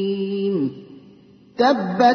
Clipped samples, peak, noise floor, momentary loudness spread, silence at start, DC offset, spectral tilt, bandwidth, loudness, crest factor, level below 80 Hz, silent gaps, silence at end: under 0.1%; -4 dBFS; -49 dBFS; 18 LU; 0 s; under 0.1%; -6.5 dB/octave; 6.6 kHz; -21 LUFS; 16 dB; -66 dBFS; none; 0 s